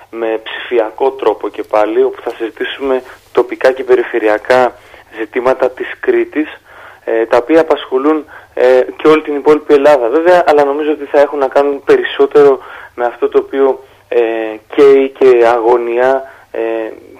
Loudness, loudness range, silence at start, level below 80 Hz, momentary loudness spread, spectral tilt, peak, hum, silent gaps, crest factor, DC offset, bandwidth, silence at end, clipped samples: -12 LUFS; 5 LU; 0.15 s; -52 dBFS; 11 LU; -5.5 dB/octave; 0 dBFS; none; none; 12 dB; under 0.1%; 11.5 kHz; 0.25 s; under 0.1%